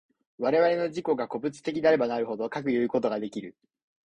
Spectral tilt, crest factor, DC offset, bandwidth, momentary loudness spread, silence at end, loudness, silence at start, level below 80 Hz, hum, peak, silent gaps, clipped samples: -6.5 dB/octave; 18 dB; under 0.1%; 10 kHz; 9 LU; 0.55 s; -27 LUFS; 0.4 s; -70 dBFS; none; -10 dBFS; none; under 0.1%